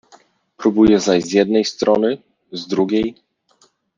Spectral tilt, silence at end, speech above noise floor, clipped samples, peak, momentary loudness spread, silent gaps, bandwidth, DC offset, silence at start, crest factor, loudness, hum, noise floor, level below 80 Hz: -5.5 dB/octave; 0.85 s; 42 dB; under 0.1%; -2 dBFS; 14 LU; none; 7.6 kHz; under 0.1%; 0.6 s; 16 dB; -17 LUFS; none; -58 dBFS; -50 dBFS